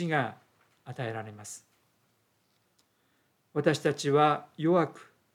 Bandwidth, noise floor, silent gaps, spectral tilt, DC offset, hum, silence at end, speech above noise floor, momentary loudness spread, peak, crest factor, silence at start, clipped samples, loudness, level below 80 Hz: 15.5 kHz; -72 dBFS; none; -5.5 dB/octave; under 0.1%; none; 0.3 s; 43 dB; 19 LU; -10 dBFS; 22 dB; 0 s; under 0.1%; -29 LUFS; -84 dBFS